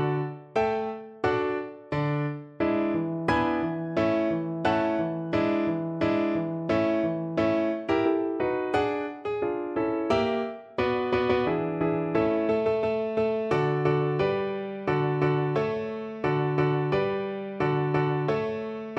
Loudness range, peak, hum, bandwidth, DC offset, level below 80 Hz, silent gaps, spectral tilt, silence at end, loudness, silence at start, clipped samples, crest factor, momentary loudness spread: 2 LU; -10 dBFS; none; 8.2 kHz; under 0.1%; -56 dBFS; none; -8 dB/octave; 0 s; -27 LUFS; 0 s; under 0.1%; 16 dB; 6 LU